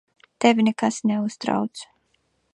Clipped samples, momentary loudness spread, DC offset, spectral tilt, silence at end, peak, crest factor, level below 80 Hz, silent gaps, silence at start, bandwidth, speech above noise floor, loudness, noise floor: under 0.1%; 10 LU; under 0.1%; -5 dB/octave; 0.7 s; -2 dBFS; 22 dB; -70 dBFS; none; 0.4 s; 10.5 kHz; 47 dB; -22 LUFS; -69 dBFS